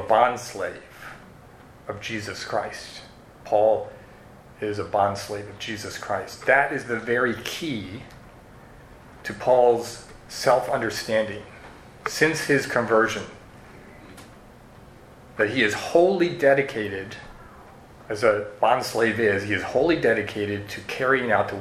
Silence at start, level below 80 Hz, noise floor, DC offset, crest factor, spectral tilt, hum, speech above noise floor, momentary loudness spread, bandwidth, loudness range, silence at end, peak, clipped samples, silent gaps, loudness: 0 s; -56 dBFS; -48 dBFS; under 0.1%; 22 dB; -4.5 dB/octave; none; 24 dB; 20 LU; 15.5 kHz; 4 LU; 0 s; -4 dBFS; under 0.1%; none; -23 LUFS